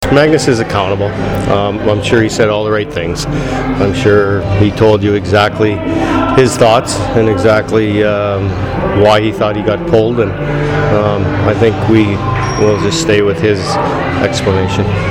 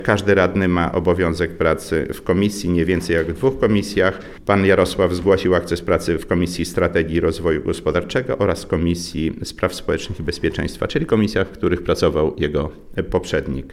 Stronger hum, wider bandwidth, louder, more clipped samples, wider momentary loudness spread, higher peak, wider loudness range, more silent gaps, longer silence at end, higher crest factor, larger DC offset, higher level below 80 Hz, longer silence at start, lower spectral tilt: neither; about the same, 15 kHz vs 15.5 kHz; first, -12 LUFS vs -19 LUFS; neither; about the same, 6 LU vs 7 LU; about the same, 0 dBFS vs -2 dBFS; about the same, 2 LU vs 4 LU; neither; about the same, 0 s vs 0 s; second, 10 dB vs 18 dB; neither; first, -30 dBFS vs -36 dBFS; about the same, 0 s vs 0 s; about the same, -6 dB/octave vs -6 dB/octave